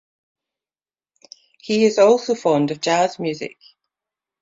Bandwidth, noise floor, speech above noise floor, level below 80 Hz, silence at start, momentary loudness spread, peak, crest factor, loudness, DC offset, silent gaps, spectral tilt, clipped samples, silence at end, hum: 7.8 kHz; under -90 dBFS; over 72 dB; -68 dBFS; 1.65 s; 16 LU; -2 dBFS; 18 dB; -18 LUFS; under 0.1%; none; -4.5 dB/octave; under 0.1%; 0.95 s; none